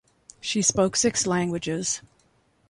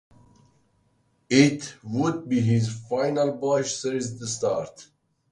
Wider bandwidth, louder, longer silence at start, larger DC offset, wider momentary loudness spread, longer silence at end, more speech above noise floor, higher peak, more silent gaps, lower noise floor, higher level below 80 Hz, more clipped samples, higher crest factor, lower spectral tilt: about the same, 11.5 kHz vs 11.5 kHz; about the same, -24 LUFS vs -25 LUFS; second, 0.45 s vs 1.3 s; neither; second, 8 LU vs 11 LU; first, 0.7 s vs 0.5 s; about the same, 40 dB vs 43 dB; about the same, -6 dBFS vs -4 dBFS; neither; about the same, -64 dBFS vs -67 dBFS; first, -56 dBFS vs -62 dBFS; neither; about the same, 20 dB vs 22 dB; second, -3 dB/octave vs -5.5 dB/octave